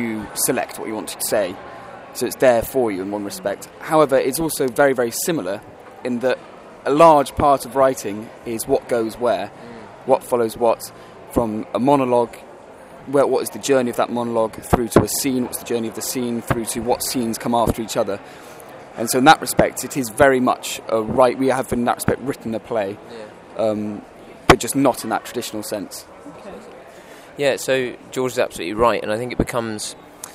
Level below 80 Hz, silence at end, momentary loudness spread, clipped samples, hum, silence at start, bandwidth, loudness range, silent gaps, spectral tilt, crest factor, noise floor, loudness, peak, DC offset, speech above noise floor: -44 dBFS; 0 s; 18 LU; under 0.1%; none; 0 s; 16 kHz; 4 LU; none; -4.5 dB/octave; 20 dB; -41 dBFS; -20 LUFS; 0 dBFS; under 0.1%; 22 dB